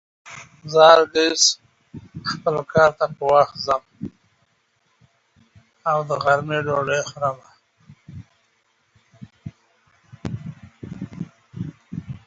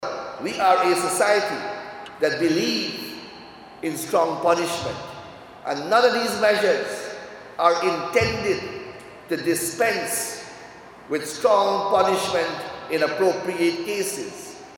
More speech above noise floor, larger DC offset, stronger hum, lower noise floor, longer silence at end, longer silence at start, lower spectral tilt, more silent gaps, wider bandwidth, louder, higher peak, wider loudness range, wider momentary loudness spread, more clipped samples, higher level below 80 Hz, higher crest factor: first, 47 dB vs 21 dB; neither; neither; first, -66 dBFS vs -43 dBFS; about the same, 0.1 s vs 0 s; first, 0.25 s vs 0 s; about the same, -3 dB/octave vs -3.5 dB/octave; neither; second, 8 kHz vs 17.5 kHz; first, -19 LUFS vs -22 LUFS; about the same, 0 dBFS vs -2 dBFS; first, 21 LU vs 3 LU; first, 25 LU vs 18 LU; neither; about the same, -56 dBFS vs -58 dBFS; about the same, 22 dB vs 20 dB